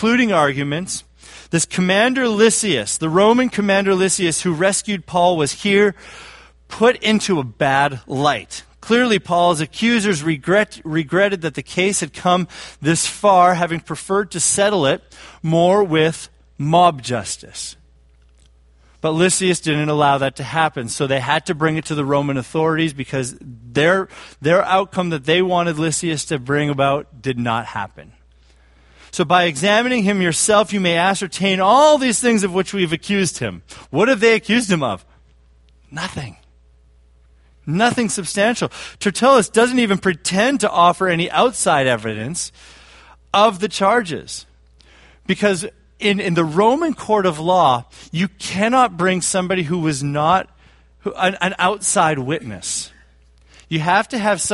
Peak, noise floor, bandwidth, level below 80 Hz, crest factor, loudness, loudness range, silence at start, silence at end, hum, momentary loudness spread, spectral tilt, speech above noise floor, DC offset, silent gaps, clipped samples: 0 dBFS; -51 dBFS; 11.5 kHz; -50 dBFS; 18 dB; -17 LUFS; 5 LU; 0 s; 0 s; none; 12 LU; -4 dB/octave; 34 dB; under 0.1%; none; under 0.1%